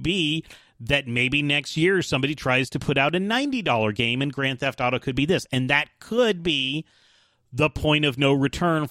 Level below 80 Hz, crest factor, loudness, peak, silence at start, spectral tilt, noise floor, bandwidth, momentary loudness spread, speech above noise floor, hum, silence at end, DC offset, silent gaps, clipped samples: -48 dBFS; 18 dB; -23 LUFS; -6 dBFS; 0 s; -5 dB/octave; -61 dBFS; 15.5 kHz; 4 LU; 38 dB; none; 0 s; under 0.1%; none; under 0.1%